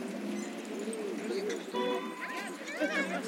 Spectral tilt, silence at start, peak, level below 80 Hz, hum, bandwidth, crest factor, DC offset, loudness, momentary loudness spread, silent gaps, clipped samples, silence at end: -4 dB/octave; 0 s; -20 dBFS; -84 dBFS; none; 16.5 kHz; 16 dB; under 0.1%; -36 LUFS; 6 LU; none; under 0.1%; 0 s